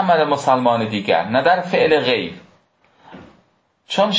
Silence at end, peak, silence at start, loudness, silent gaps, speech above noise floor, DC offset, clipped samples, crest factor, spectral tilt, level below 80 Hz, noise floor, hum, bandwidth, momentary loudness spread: 0 s; -2 dBFS; 0 s; -17 LUFS; none; 44 dB; under 0.1%; under 0.1%; 16 dB; -5 dB/octave; -58 dBFS; -60 dBFS; none; 8 kHz; 6 LU